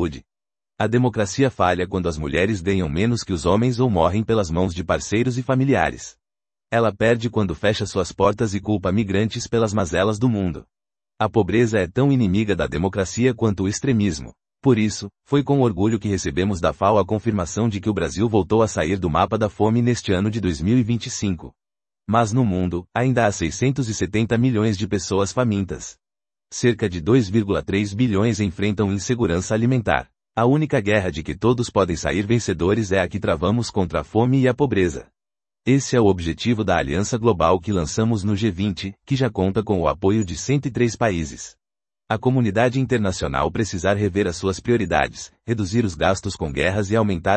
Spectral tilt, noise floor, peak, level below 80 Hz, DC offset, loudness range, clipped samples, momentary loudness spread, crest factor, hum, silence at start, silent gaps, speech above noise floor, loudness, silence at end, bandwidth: -6 dB/octave; under -90 dBFS; 0 dBFS; -44 dBFS; under 0.1%; 2 LU; under 0.1%; 6 LU; 20 dB; none; 0 s; none; over 70 dB; -21 LUFS; 0 s; 8.8 kHz